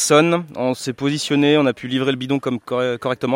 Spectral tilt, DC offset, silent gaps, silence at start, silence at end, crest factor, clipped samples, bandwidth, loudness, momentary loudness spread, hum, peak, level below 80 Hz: -4.5 dB/octave; under 0.1%; none; 0 s; 0 s; 16 dB; under 0.1%; 16.5 kHz; -19 LUFS; 8 LU; none; -2 dBFS; -62 dBFS